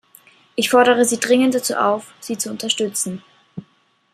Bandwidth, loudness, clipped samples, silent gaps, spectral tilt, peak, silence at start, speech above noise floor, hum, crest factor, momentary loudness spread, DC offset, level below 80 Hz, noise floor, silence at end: 15.5 kHz; -18 LUFS; under 0.1%; none; -2.5 dB/octave; -2 dBFS; 0.55 s; 42 dB; none; 18 dB; 23 LU; under 0.1%; -68 dBFS; -60 dBFS; 0.55 s